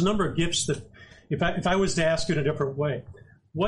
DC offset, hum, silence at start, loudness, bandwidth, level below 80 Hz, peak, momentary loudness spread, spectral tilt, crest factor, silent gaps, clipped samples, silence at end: under 0.1%; none; 0 s; -26 LUFS; 11.5 kHz; -44 dBFS; -12 dBFS; 10 LU; -4.5 dB/octave; 14 dB; none; under 0.1%; 0 s